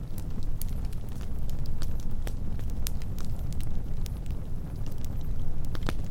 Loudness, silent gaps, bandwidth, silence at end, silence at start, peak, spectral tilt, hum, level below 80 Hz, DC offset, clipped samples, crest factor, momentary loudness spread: -37 LUFS; none; 16 kHz; 0 s; 0 s; -6 dBFS; -6 dB/octave; none; -32 dBFS; under 0.1%; under 0.1%; 20 dB; 3 LU